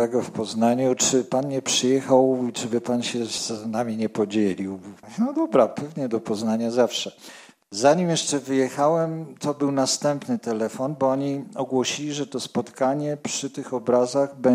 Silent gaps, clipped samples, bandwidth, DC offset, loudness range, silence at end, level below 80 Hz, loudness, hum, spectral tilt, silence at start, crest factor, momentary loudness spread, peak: none; under 0.1%; 16 kHz; under 0.1%; 4 LU; 0 s; -70 dBFS; -23 LUFS; none; -4.5 dB/octave; 0 s; 18 dB; 9 LU; -4 dBFS